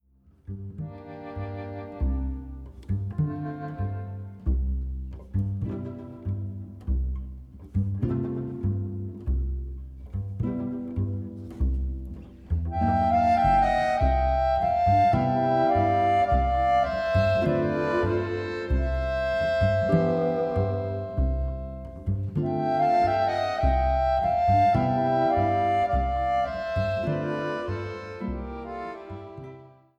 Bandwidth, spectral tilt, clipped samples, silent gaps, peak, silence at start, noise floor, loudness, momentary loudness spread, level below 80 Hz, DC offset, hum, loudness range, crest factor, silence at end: 7.8 kHz; -8.5 dB/octave; under 0.1%; none; -10 dBFS; 0.5 s; -47 dBFS; -26 LUFS; 16 LU; -34 dBFS; under 0.1%; none; 10 LU; 16 dB; 0.3 s